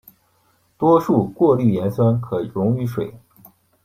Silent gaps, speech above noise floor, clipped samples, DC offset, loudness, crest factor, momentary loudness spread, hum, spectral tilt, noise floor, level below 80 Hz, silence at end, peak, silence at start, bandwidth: none; 44 dB; under 0.1%; under 0.1%; -19 LUFS; 16 dB; 9 LU; none; -10 dB/octave; -61 dBFS; -54 dBFS; 0.65 s; -2 dBFS; 0.8 s; 15.5 kHz